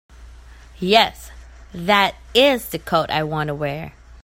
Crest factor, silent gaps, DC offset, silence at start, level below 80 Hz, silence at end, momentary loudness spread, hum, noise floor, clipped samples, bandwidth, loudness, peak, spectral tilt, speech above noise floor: 20 dB; none; under 0.1%; 0.2 s; -44 dBFS; 0.05 s; 16 LU; none; -42 dBFS; under 0.1%; 16.5 kHz; -19 LUFS; 0 dBFS; -4.5 dB/octave; 23 dB